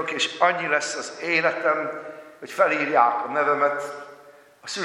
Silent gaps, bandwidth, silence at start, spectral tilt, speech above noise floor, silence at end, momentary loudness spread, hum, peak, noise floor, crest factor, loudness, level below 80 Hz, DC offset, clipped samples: none; 14.5 kHz; 0 s; -2.5 dB/octave; 27 dB; 0 s; 17 LU; none; -4 dBFS; -50 dBFS; 20 dB; -22 LUFS; -82 dBFS; under 0.1%; under 0.1%